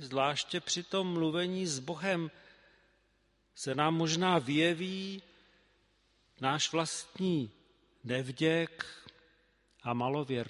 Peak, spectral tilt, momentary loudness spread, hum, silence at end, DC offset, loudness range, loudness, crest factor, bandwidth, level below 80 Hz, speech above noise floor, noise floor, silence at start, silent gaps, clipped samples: -12 dBFS; -4.5 dB/octave; 14 LU; none; 0 s; under 0.1%; 3 LU; -33 LUFS; 22 dB; 11.5 kHz; -74 dBFS; 40 dB; -73 dBFS; 0 s; none; under 0.1%